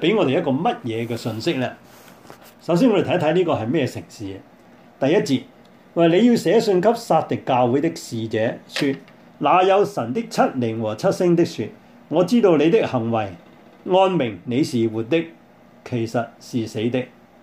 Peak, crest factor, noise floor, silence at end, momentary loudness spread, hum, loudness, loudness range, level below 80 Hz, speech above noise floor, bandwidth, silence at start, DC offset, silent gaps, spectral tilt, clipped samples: -4 dBFS; 18 dB; -48 dBFS; 0.35 s; 13 LU; none; -20 LUFS; 3 LU; -64 dBFS; 28 dB; 16 kHz; 0 s; under 0.1%; none; -6.5 dB/octave; under 0.1%